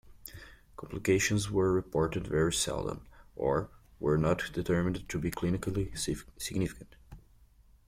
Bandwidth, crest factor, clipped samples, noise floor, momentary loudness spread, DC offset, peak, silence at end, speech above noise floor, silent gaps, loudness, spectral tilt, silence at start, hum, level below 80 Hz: 16.5 kHz; 18 dB; under 0.1%; -61 dBFS; 19 LU; under 0.1%; -14 dBFS; 0.7 s; 30 dB; none; -32 LUFS; -5 dB/octave; 0.05 s; none; -50 dBFS